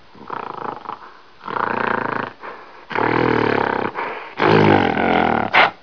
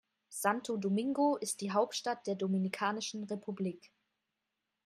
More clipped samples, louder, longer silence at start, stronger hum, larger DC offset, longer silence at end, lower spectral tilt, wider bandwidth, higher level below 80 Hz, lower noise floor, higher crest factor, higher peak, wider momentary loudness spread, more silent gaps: neither; first, -18 LUFS vs -35 LUFS; about the same, 0.2 s vs 0.3 s; neither; first, 0.4% vs under 0.1%; second, 0.1 s vs 1 s; first, -7 dB/octave vs -4.5 dB/octave; second, 5.4 kHz vs 14.5 kHz; first, -52 dBFS vs -84 dBFS; second, -42 dBFS vs -87 dBFS; about the same, 18 dB vs 20 dB; first, 0 dBFS vs -16 dBFS; first, 19 LU vs 9 LU; neither